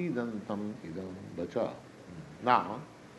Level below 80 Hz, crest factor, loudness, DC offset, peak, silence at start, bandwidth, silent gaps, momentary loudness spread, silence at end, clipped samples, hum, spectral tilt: -68 dBFS; 26 dB; -34 LUFS; under 0.1%; -10 dBFS; 0 s; 12 kHz; none; 20 LU; 0 s; under 0.1%; none; -7 dB/octave